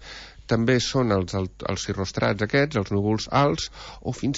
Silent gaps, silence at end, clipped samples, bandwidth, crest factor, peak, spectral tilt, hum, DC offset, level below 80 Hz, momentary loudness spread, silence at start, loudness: none; 0 s; under 0.1%; 8 kHz; 16 dB; -8 dBFS; -5.5 dB/octave; none; under 0.1%; -46 dBFS; 12 LU; 0 s; -24 LUFS